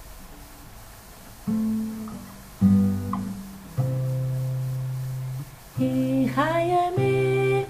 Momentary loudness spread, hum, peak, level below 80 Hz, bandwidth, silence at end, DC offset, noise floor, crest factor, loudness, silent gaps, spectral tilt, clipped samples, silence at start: 23 LU; none; -8 dBFS; -50 dBFS; 15.5 kHz; 0 s; under 0.1%; -44 dBFS; 16 dB; -25 LUFS; none; -7.5 dB/octave; under 0.1%; 0 s